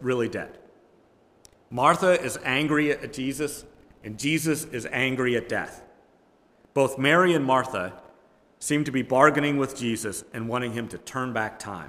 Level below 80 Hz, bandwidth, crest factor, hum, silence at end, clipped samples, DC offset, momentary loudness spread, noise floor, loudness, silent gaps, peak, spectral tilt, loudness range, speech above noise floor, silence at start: -60 dBFS; 16 kHz; 22 dB; none; 0 s; under 0.1%; under 0.1%; 14 LU; -60 dBFS; -25 LUFS; none; -4 dBFS; -4.5 dB/octave; 5 LU; 36 dB; 0 s